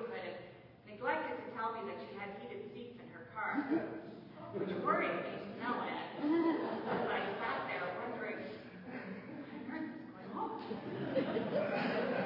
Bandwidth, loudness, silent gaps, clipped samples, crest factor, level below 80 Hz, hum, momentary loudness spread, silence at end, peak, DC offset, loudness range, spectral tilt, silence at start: 5.8 kHz; -39 LUFS; none; under 0.1%; 20 dB; -78 dBFS; none; 14 LU; 0 s; -20 dBFS; under 0.1%; 6 LU; -4 dB/octave; 0 s